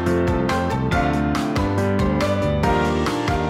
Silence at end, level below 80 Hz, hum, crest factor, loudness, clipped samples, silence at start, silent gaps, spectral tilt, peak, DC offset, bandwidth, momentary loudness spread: 0 s; -32 dBFS; none; 14 dB; -20 LUFS; under 0.1%; 0 s; none; -6.5 dB/octave; -4 dBFS; under 0.1%; 15.5 kHz; 2 LU